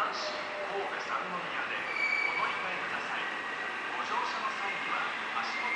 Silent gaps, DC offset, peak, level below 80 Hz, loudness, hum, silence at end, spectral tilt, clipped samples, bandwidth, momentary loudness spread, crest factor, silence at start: none; under 0.1%; -20 dBFS; -74 dBFS; -32 LUFS; none; 0 s; -2 dB/octave; under 0.1%; 11 kHz; 6 LU; 14 dB; 0 s